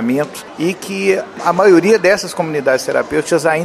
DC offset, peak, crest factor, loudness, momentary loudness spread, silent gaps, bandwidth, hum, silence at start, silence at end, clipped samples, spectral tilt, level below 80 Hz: under 0.1%; 0 dBFS; 14 dB; -14 LUFS; 10 LU; none; 14.5 kHz; none; 0 s; 0 s; under 0.1%; -5 dB/octave; -54 dBFS